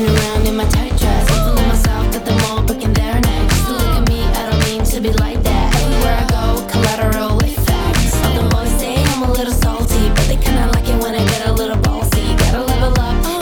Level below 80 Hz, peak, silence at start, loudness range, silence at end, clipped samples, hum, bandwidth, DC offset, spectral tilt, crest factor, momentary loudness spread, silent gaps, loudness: -16 dBFS; -2 dBFS; 0 s; 0 LU; 0 s; under 0.1%; none; over 20 kHz; under 0.1%; -5 dB/octave; 12 dB; 2 LU; none; -16 LUFS